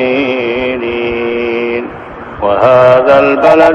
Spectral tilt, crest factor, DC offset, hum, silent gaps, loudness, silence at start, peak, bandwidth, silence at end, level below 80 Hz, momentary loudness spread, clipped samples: -7 dB/octave; 10 dB; under 0.1%; none; none; -10 LUFS; 0 s; 0 dBFS; 7.8 kHz; 0 s; -40 dBFS; 12 LU; 1%